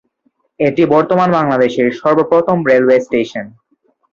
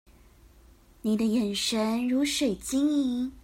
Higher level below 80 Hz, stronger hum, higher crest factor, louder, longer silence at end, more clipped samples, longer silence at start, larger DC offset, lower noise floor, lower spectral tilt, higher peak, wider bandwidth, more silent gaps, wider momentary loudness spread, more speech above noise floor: about the same, -56 dBFS vs -56 dBFS; neither; about the same, 14 dB vs 12 dB; first, -13 LUFS vs -27 LUFS; first, 0.65 s vs 0.05 s; neither; second, 0.6 s vs 1.05 s; neither; first, -62 dBFS vs -56 dBFS; first, -7.5 dB/octave vs -4 dB/octave; first, 0 dBFS vs -16 dBFS; second, 7.2 kHz vs 16 kHz; neither; first, 7 LU vs 4 LU; first, 49 dB vs 29 dB